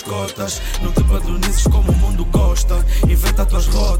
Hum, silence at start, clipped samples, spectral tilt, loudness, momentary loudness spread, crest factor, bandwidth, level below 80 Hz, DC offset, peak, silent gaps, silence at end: none; 0 s; under 0.1%; -5 dB/octave; -18 LUFS; 7 LU; 10 dB; 16.5 kHz; -16 dBFS; under 0.1%; -4 dBFS; none; 0 s